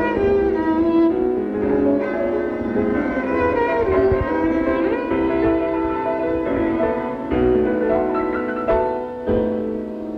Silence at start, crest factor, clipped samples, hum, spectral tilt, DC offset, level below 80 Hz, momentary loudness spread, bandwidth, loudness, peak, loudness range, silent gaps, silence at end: 0 s; 12 dB; under 0.1%; none; -9 dB/octave; under 0.1%; -38 dBFS; 5 LU; 5.8 kHz; -20 LUFS; -6 dBFS; 1 LU; none; 0 s